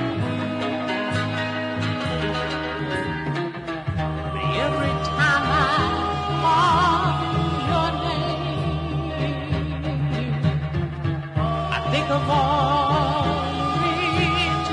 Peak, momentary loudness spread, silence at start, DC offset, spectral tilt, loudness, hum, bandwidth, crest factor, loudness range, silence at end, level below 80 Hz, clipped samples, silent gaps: -8 dBFS; 7 LU; 0 s; under 0.1%; -6 dB/octave; -23 LUFS; none; 10.5 kHz; 14 dB; 5 LU; 0 s; -40 dBFS; under 0.1%; none